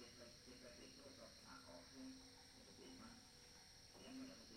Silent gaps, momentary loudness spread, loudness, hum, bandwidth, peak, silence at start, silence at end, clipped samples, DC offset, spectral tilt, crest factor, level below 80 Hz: none; 5 LU; -60 LUFS; none; 16 kHz; -46 dBFS; 0 s; 0 s; under 0.1%; under 0.1%; -3 dB/octave; 16 dB; -76 dBFS